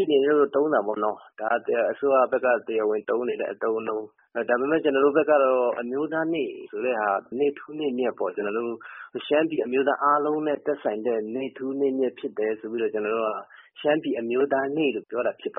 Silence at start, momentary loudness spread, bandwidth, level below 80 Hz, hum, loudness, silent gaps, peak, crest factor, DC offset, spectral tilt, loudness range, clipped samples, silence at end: 0 s; 9 LU; 3.8 kHz; -74 dBFS; none; -25 LUFS; none; -8 dBFS; 18 dB; under 0.1%; 0 dB/octave; 4 LU; under 0.1%; 0.05 s